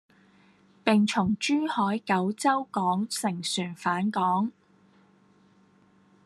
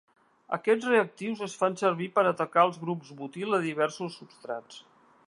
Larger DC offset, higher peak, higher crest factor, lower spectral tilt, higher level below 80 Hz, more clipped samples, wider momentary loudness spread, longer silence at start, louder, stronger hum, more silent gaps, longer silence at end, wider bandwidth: neither; about the same, -6 dBFS vs -8 dBFS; about the same, 22 dB vs 20 dB; about the same, -4.5 dB/octave vs -5.5 dB/octave; first, -68 dBFS vs -82 dBFS; neither; second, 6 LU vs 14 LU; first, 0.85 s vs 0.5 s; about the same, -27 LUFS vs -28 LUFS; neither; neither; first, 1.75 s vs 0.5 s; about the same, 12.5 kHz vs 11.5 kHz